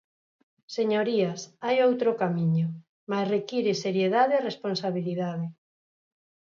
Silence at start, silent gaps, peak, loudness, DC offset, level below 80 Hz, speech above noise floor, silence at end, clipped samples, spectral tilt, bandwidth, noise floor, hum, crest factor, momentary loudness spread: 0.7 s; 2.89-3.07 s; -12 dBFS; -27 LUFS; under 0.1%; -76 dBFS; over 64 dB; 0.95 s; under 0.1%; -6.5 dB/octave; 7.4 kHz; under -90 dBFS; none; 16 dB; 10 LU